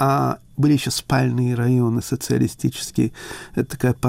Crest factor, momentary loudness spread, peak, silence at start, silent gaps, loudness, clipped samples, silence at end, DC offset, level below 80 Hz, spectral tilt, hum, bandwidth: 12 dB; 7 LU; -8 dBFS; 0 s; none; -21 LUFS; under 0.1%; 0 s; under 0.1%; -48 dBFS; -6 dB/octave; none; 16 kHz